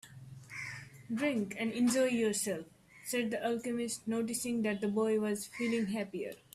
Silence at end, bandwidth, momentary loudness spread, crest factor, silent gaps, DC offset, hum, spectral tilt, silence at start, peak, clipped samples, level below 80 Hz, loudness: 0.2 s; 15 kHz; 13 LU; 14 dB; none; under 0.1%; none; -4 dB/octave; 0.05 s; -20 dBFS; under 0.1%; -72 dBFS; -34 LUFS